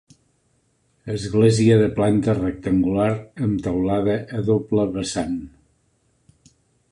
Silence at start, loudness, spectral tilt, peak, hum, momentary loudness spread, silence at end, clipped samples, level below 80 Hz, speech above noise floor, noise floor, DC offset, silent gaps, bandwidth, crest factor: 1.05 s; -21 LUFS; -7 dB/octave; -4 dBFS; none; 11 LU; 1.45 s; under 0.1%; -46 dBFS; 45 dB; -65 dBFS; under 0.1%; none; 11 kHz; 18 dB